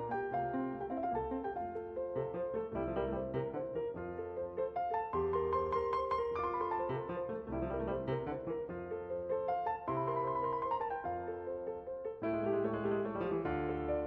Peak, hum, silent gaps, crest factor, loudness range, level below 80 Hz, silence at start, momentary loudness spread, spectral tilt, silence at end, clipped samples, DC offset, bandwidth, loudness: -22 dBFS; none; none; 14 dB; 2 LU; -56 dBFS; 0 s; 6 LU; -6.5 dB/octave; 0 s; under 0.1%; under 0.1%; 5.8 kHz; -38 LUFS